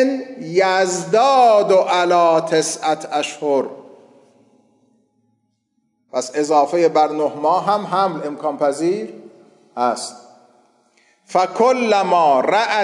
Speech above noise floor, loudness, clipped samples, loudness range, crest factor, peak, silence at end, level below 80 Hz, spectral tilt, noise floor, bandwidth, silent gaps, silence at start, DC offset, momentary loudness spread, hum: 52 dB; -17 LUFS; under 0.1%; 9 LU; 14 dB; -4 dBFS; 0 s; -80 dBFS; -4 dB/octave; -68 dBFS; 11.5 kHz; none; 0 s; under 0.1%; 10 LU; none